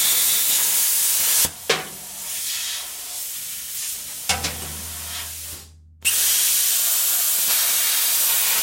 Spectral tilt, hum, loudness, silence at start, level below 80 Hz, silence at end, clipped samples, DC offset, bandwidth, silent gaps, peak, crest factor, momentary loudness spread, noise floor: 1 dB/octave; none; -18 LUFS; 0 s; -54 dBFS; 0 s; under 0.1%; under 0.1%; 16.5 kHz; none; -4 dBFS; 18 dB; 13 LU; -43 dBFS